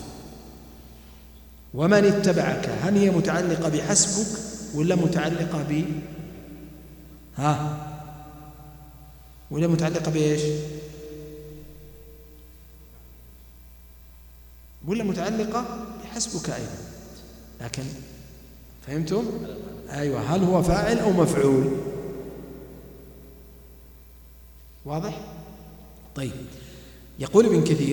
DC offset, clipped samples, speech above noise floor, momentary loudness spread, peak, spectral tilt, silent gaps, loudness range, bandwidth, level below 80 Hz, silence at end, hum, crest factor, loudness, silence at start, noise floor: under 0.1%; under 0.1%; 25 dB; 25 LU; -4 dBFS; -5.5 dB/octave; none; 16 LU; 19 kHz; -46 dBFS; 0 s; 60 Hz at -45 dBFS; 22 dB; -24 LUFS; 0 s; -48 dBFS